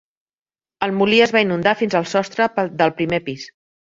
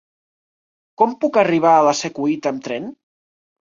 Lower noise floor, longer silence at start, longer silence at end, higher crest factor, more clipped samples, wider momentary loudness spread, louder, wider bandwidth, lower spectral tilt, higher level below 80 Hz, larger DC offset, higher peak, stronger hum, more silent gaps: about the same, under -90 dBFS vs under -90 dBFS; second, 0.8 s vs 1 s; second, 0.5 s vs 0.7 s; about the same, 18 dB vs 18 dB; neither; about the same, 12 LU vs 14 LU; about the same, -18 LUFS vs -17 LUFS; about the same, 7.8 kHz vs 7.6 kHz; about the same, -5 dB/octave vs -4.5 dB/octave; first, -58 dBFS vs -66 dBFS; neither; about the same, -2 dBFS vs -2 dBFS; neither; neither